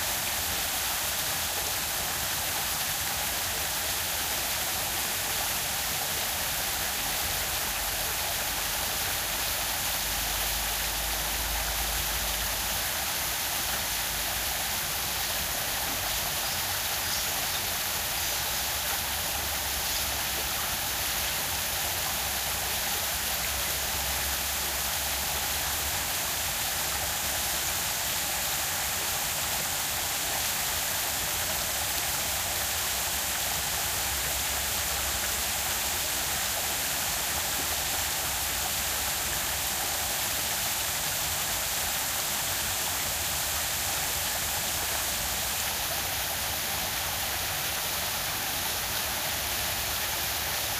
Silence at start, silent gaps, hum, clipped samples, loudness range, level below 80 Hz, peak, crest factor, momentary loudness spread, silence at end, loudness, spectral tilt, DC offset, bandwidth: 0 s; none; none; under 0.1%; 1 LU; -46 dBFS; -10 dBFS; 20 dB; 1 LU; 0 s; -27 LUFS; -0.5 dB/octave; under 0.1%; 16 kHz